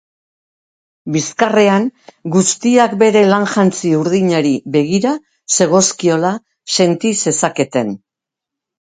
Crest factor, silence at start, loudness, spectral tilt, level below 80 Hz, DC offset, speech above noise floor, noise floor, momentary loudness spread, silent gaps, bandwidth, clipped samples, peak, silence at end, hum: 14 dB; 1.05 s; -14 LUFS; -4.5 dB/octave; -60 dBFS; under 0.1%; 71 dB; -84 dBFS; 9 LU; none; 9.6 kHz; under 0.1%; 0 dBFS; 0.9 s; none